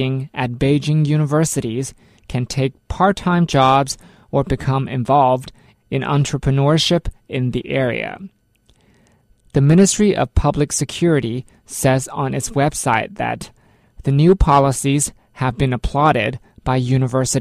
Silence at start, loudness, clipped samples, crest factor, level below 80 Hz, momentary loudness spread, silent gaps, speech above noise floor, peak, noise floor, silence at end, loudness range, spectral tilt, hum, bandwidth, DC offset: 0 s; -18 LUFS; under 0.1%; 16 dB; -34 dBFS; 11 LU; none; 40 dB; -2 dBFS; -57 dBFS; 0 s; 3 LU; -5.5 dB/octave; none; 13.5 kHz; under 0.1%